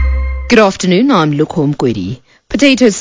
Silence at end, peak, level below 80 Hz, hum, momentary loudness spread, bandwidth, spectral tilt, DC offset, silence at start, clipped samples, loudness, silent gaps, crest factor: 0 s; 0 dBFS; -22 dBFS; none; 12 LU; 8 kHz; -5.5 dB/octave; under 0.1%; 0 s; 1%; -11 LUFS; none; 12 dB